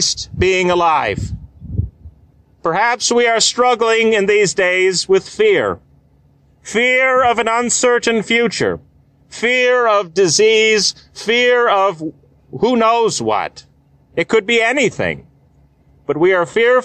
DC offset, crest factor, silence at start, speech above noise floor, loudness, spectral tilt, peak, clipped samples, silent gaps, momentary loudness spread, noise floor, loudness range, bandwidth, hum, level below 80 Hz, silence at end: under 0.1%; 12 dB; 0 s; 38 dB; -14 LUFS; -3 dB/octave; -2 dBFS; under 0.1%; none; 13 LU; -52 dBFS; 3 LU; 10.5 kHz; none; -40 dBFS; 0 s